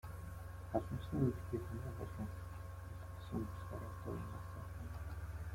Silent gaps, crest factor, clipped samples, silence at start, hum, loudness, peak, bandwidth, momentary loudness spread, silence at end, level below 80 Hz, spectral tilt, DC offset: none; 22 dB; under 0.1%; 0.05 s; none; -45 LUFS; -22 dBFS; 16.5 kHz; 12 LU; 0 s; -54 dBFS; -8 dB/octave; under 0.1%